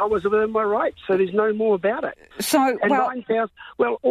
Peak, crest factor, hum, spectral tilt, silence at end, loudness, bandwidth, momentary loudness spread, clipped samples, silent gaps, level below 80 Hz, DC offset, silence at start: -6 dBFS; 14 dB; none; -4.5 dB/octave; 0 s; -22 LUFS; 14.5 kHz; 6 LU; under 0.1%; none; -56 dBFS; under 0.1%; 0 s